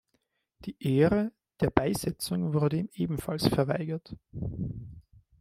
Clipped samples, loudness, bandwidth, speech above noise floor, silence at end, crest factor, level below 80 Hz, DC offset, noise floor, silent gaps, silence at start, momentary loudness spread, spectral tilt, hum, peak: under 0.1%; -29 LUFS; 16 kHz; 48 dB; 0.4 s; 28 dB; -52 dBFS; under 0.1%; -76 dBFS; none; 0.6 s; 16 LU; -6.5 dB/octave; none; -2 dBFS